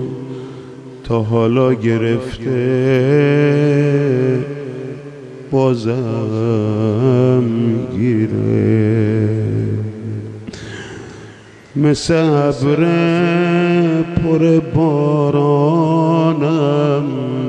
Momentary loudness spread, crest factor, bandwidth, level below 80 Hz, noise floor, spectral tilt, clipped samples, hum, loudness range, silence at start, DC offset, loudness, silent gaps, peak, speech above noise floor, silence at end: 16 LU; 14 dB; 9.8 kHz; -46 dBFS; -39 dBFS; -8 dB/octave; under 0.1%; none; 4 LU; 0 s; under 0.1%; -15 LUFS; none; -2 dBFS; 25 dB; 0 s